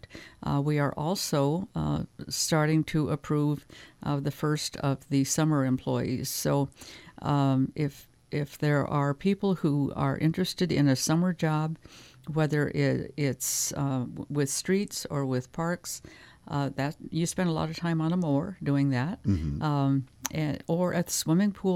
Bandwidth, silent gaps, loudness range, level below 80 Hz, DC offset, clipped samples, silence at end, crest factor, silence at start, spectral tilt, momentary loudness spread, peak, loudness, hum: 16.5 kHz; none; 3 LU; -52 dBFS; under 0.1%; under 0.1%; 0 s; 18 dB; 0.1 s; -5.5 dB/octave; 8 LU; -10 dBFS; -28 LUFS; none